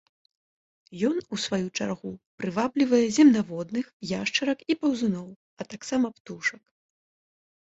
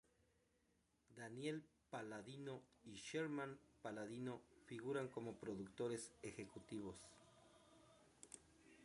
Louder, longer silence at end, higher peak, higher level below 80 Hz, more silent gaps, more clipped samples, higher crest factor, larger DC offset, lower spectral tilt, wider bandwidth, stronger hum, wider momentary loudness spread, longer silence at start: first, -26 LUFS vs -52 LUFS; first, 1.25 s vs 0 s; first, -8 dBFS vs -34 dBFS; first, -66 dBFS vs -82 dBFS; first, 2.26-2.38 s, 3.93-4.00 s, 5.36-5.57 s, 6.20-6.25 s vs none; neither; about the same, 18 dB vs 20 dB; neither; about the same, -4.5 dB/octave vs -5 dB/octave; second, 8 kHz vs 11.5 kHz; neither; about the same, 17 LU vs 18 LU; second, 0.9 s vs 1.1 s